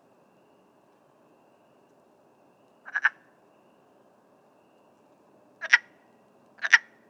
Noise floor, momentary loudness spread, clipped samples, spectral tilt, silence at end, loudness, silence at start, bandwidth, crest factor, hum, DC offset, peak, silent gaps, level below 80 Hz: -61 dBFS; 17 LU; under 0.1%; 1.5 dB/octave; 0.3 s; -24 LUFS; 2.95 s; 9 kHz; 30 dB; none; under 0.1%; -2 dBFS; none; under -90 dBFS